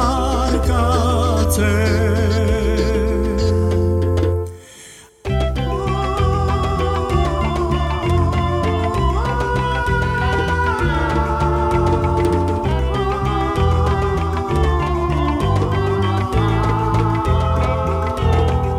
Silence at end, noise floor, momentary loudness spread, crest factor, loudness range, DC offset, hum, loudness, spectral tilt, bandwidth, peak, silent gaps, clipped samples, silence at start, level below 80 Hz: 0 s; -41 dBFS; 3 LU; 14 dB; 3 LU; under 0.1%; none; -18 LUFS; -6.5 dB/octave; 13.5 kHz; -4 dBFS; none; under 0.1%; 0 s; -24 dBFS